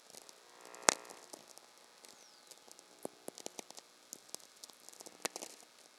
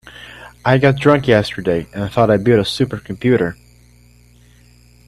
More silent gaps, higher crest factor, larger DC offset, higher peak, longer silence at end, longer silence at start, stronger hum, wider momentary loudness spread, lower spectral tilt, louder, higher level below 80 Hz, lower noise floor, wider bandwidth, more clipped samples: neither; first, 46 dB vs 18 dB; neither; about the same, 0 dBFS vs 0 dBFS; second, 0 s vs 1.55 s; about the same, 0 s vs 0.05 s; second, none vs 60 Hz at -35 dBFS; first, 25 LU vs 11 LU; second, 0 dB/octave vs -7 dB/octave; second, -40 LUFS vs -16 LUFS; second, -90 dBFS vs -44 dBFS; first, -61 dBFS vs -48 dBFS; first, 16 kHz vs 13 kHz; neither